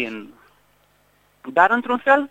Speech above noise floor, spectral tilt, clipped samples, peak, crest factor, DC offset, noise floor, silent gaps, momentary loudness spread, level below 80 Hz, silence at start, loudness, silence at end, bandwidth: 41 dB; -5 dB/octave; under 0.1%; 0 dBFS; 22 dB; under 0.1%; -60 dBFS; none; 20 LU; -68 dBFS; 0 s; -18 LUFS; 0.05 s; 9.4 kHz